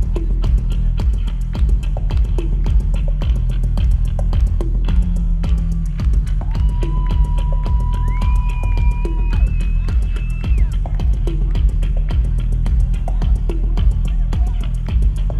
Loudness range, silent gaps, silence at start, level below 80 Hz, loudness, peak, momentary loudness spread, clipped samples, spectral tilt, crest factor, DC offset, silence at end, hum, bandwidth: 1 LU; none; 0 s; -16 dBFS; -20 LUFS; -4 dBFS; 2 LU; under 0.1%; -8 dB/octave; 12 dB; under 0.1%; 0 s; none; 4.9 kHz